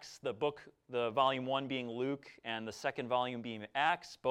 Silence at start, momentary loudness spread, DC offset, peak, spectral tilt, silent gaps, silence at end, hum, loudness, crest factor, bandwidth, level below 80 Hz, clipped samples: 0 s; 10 LU; under 0.1%; -16 dBFS; -4.5 dB/octave; none; 0 s; none; -37 LUFS; 20 dB; 15 kHz; -78 dBFS; under 0.1%